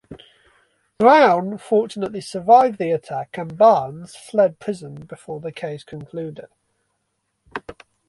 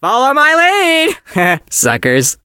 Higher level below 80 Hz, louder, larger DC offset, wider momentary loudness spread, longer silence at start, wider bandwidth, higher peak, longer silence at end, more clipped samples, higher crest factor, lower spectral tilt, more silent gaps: second, -62 dBFS vs -52 dBFS; second, -18 LUFS vs -11 LUFS; neither; first, 20 LU vs 5 LU; about the same, 0.1 s vs 0 s; second, 11.5 kHz vs 17.5 kHz; about the same, -2 dBFS vs 0 dBFS; first, 0.35 s vs 0.1 s; neither; first, 20 dB vs 12 dB; first, -6 dB/octave vs -2.5 dB/octave; neither